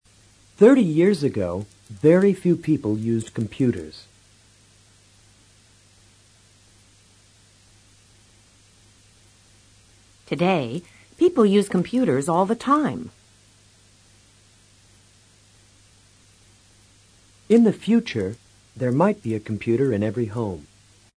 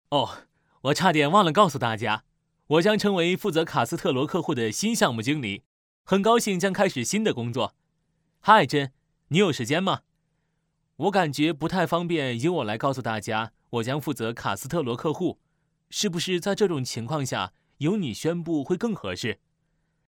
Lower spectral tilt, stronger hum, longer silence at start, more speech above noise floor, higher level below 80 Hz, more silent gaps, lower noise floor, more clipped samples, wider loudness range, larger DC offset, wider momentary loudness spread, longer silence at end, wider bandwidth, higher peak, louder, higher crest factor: first, -7 dB/octave vs -5 dB/octave; neither; first, 0.6 s vs 0.1 s; second, 35 dB vs 50 dB; about the same, -60 dBFS vs -62 dBFS; second, none vs 5.66-6.05 s; second, -55 dBFS vs -74 dBFS; neither; first, 10 LU vs 5 LU; neither; first, 15 LU vs 10 LU; second, 0.55 s vs 0.85 s; second, 11 kHz vs 19.5 kHz; about the same, -4 dBFS vs -2 dBFS; first, -21 LUFS vs -25 LUFS; about the same, 20 dB vs 22 dB